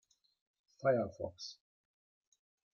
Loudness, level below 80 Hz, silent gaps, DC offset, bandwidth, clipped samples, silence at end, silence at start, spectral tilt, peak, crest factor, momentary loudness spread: -37 LUFS; -78 dBFS; none; under 0.1%; 7.2 kHz; under 0.1%; 1.2 s; 0.8 s; -6 dB/octave; -20 dBFS; 22 dB; 15 LU